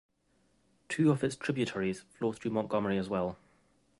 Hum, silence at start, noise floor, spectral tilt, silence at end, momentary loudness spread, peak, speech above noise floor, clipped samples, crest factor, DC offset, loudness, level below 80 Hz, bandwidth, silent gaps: none; 0.9 s; -72 dBFS; -6.5 dB/octave; 0.65 s; 9 LU; -16 dBFS; 40 dB; under 0.1%; 18 dB; under 0.1%; -33 LUFS; -64 dBFS; 11.5 kHz; none